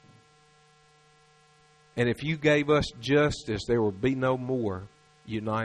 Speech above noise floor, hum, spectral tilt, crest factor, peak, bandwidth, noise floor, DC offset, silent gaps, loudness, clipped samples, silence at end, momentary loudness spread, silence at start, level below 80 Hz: 34 dB; none; -6 dB/octave; 20 dB; -10 dBFS; 11.5 kHz; -60 dBFS; under 0.1%; none; -27 LUFS; under 0.1%; 0 s; 10 LU; 1.95 s; -52 dBFS